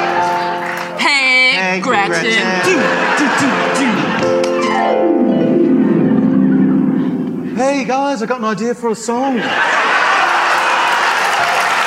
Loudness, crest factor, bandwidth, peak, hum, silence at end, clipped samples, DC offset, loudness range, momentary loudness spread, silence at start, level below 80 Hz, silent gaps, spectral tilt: -13 LUFS; 12 dB; 15.5 kHz; -2 dBFS; none; 0 s; under 0.1%; under 0.1%; 3 LU; 6 LU; 0 s; -60 dBFS; none; -4.5 dB/octave